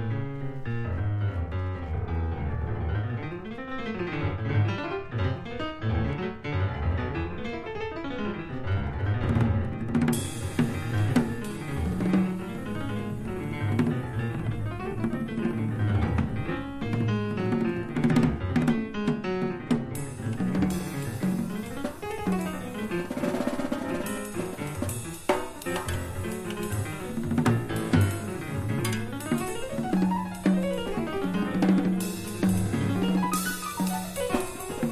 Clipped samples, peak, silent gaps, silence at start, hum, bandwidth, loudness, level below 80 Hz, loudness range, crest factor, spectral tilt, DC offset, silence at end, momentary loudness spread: under 0.1%; -10 dBFS; none; 0 s; none; 15.5 kHz; -29 LUFS; -40 dBFS; 4 LU; 18 dB; -6.5 dB/octave; under 0.1%; 0 s; 8 LU